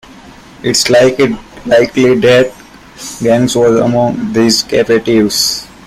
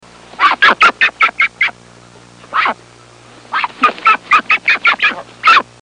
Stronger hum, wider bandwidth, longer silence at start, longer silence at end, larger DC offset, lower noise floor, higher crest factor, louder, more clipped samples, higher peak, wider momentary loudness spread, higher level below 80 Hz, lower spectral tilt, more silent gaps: neither; first, 16 kHz vs 10.5 kHz; second, 0.25 s vs 0.4 s; about the same, 0.2 s vs 0.2 s; neither; second, -35 dBFS vs -41 dBFS; about the same, 12 dB vs 14 dB; about the same, -10 LUFS vs -11 LUFS; neither; about the same, 0 dBFS vs 0 dBFS; about the same, 9 LU vs 9 LU; first, -42 dBFS vs -56 dBFS; first, -4 dB/octave vs -1.5 dB/octave; neither